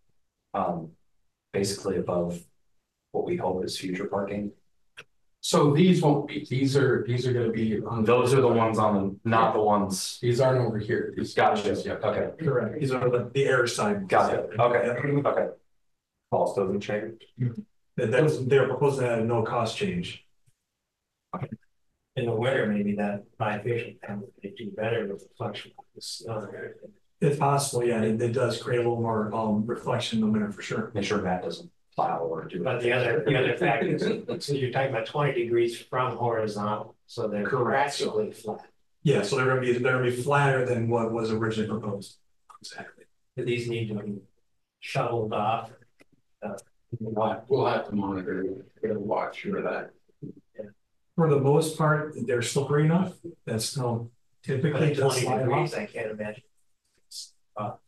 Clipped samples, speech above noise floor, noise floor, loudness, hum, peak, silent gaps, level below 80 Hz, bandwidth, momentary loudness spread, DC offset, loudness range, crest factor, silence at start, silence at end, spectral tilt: under 0.1%; 57 dB; -83 dBFS; -27 LUFS; none; -10 dBFS; none; -64 dBFS; 12.5 kHz; 16 LU; under 0.1%; 8 LU; 16 dB; 0.55 s; 0.1 s; -6 dB/octave